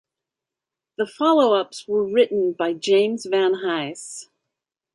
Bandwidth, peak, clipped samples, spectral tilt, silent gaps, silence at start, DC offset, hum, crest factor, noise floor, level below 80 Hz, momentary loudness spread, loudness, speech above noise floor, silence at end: 11.5 kHz; -6 dBFS; under 0.1%; -4 dB/octave; none; 1 s; under 0.1%; none; 16 dB; -87 dBFS; -74 dBFS; 15 LU; -21 LUFS; 67 dB; 0.7 s